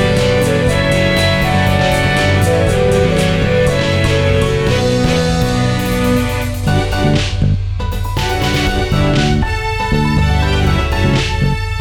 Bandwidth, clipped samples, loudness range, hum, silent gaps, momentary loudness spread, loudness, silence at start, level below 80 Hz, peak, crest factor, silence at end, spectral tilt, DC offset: 17.5 kHz; under 0.1%; 3 LU; none; none; 4 LU; -14 LUFS; 0 s; -22 dBFS; 0 dBFS; 12 dB; 0 s; -5.5 dB/octave; 0.1%